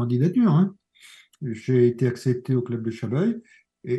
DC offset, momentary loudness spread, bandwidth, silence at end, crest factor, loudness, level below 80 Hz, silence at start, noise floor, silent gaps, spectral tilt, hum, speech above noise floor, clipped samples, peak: under 0.1%; 14 LU; 12 kHz; 0 s; 16 dB; -23 LUFS; -68 dBFS; 0 s; -52 dBFS; none; -9 dB/octave; none; 29 dB; under 0.1%; -8 dBFS